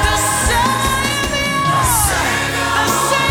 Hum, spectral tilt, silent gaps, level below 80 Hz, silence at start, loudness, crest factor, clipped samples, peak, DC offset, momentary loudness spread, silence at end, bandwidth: none; -2.5 dB/octave; none; -26 dBFS; 0 s; -15 LUFS; 16 dB; under 0.1%; 0 dBFS; under 0.1%; 3 LU; 0 s; 19.5 kHz